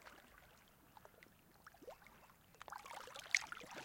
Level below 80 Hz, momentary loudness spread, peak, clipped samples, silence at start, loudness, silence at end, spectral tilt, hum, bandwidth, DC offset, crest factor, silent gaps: -78 dBFS; 26 LU; -16 dBFS; under 0.1%; 0 s; -44 LUFS; 0 s; 0 dB/octave; none; 16.5 kHz; under 0.1%; 34 dB; none